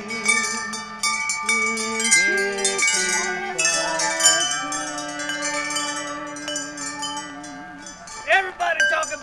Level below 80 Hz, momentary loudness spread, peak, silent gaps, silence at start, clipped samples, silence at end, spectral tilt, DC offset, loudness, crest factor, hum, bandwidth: -58 dBFS; 14 LU; -2 dBFS; none; 0 s; under 0.1%; 0 s; 0 dB/octave; under 0.1%; -21 LUFS; 22 dB; none; 16 kHz